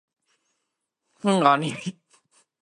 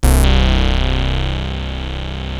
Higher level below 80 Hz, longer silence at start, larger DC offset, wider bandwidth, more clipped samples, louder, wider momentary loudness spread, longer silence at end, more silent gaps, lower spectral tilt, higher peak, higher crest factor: second, -74 dBFS vs -16 dBFS; first, 1.25 s vs 0 s; neither; second, 11.5 kHz vs 14 kHz; neither; second, -22 LUFS vs -18 LUFS; first, 16 LU vs 11 LU; first, 0.7 s vs 0 s; neither; about the same, -5.5 dB/octave vs -5 dB/octave; about the same, -2 dBFS vs 0 dBFS; first, 24 dB vs 14 dB